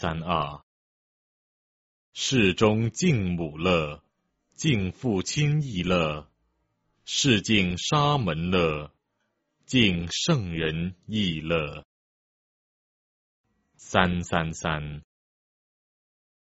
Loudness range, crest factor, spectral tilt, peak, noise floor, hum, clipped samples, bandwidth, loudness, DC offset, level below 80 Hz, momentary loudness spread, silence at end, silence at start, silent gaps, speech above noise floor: 5 LU; 26 dB; -4.5 dB/octave; -2 dBFS; -77 dBFS; none; under 0.1%; 8 kHz; -25 LUFS; under 0.1%; -50 dBFS; 13 LU; 1.45 s; 0 s; 0.63-2.13 s, 11.85-13.44 s; 52 dB